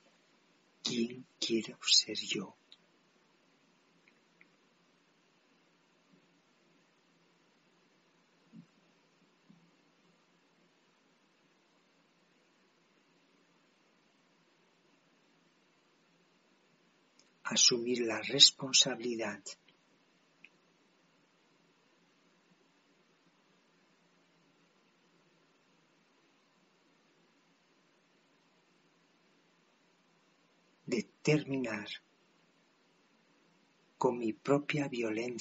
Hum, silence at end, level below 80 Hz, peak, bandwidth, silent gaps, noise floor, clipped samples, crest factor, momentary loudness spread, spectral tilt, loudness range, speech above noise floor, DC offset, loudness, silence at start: none; 0 s; -88 dBFS; -6 dBFS; 8 kHz; none; -70 dBFS; under 0.1%; 32 dB; 19 LU; -2 dB/octave; 17 LU; 39 dB; under 0.1%; -30 LUFS; 0.85 s